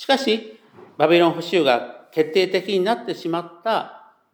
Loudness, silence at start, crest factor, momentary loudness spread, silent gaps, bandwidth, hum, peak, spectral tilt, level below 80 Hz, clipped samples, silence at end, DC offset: -21 LUFS; 0 s; 20 dB; 9 LU; none; 19.5 kHz; none; -2 dBFS; -5 dB/octave; -82 dBFS; under 0.1%; 0.35 s; under 0.1%